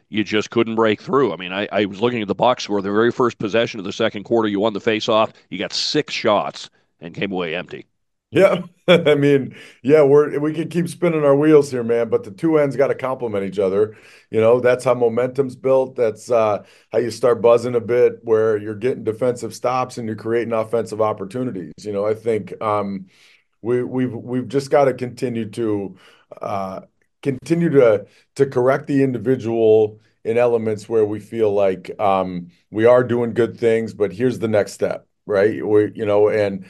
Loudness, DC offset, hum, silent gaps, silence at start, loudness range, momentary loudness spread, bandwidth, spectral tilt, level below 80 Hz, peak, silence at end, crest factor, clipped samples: -19 LUFS; under 0.1%; none; none; 0.1 s; 6 LU; 11 LU; 12.5 kHz; -6 dB/octave; -66 dBFS; 0 dBFS; 0.05 s; 18 dB; under 0.1%